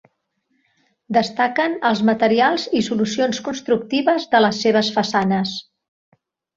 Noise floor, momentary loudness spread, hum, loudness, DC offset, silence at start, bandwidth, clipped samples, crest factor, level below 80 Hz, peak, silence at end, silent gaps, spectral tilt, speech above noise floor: -69 dBFS; 6 LU; none; -19 LUFS; under 0.1%; 1.1 s; 7.8 kHz; under 0.1%; 18 dB; -62 dBFS; -2 dBFS; 0.95 s; none; -5 dB/octave; 51 dB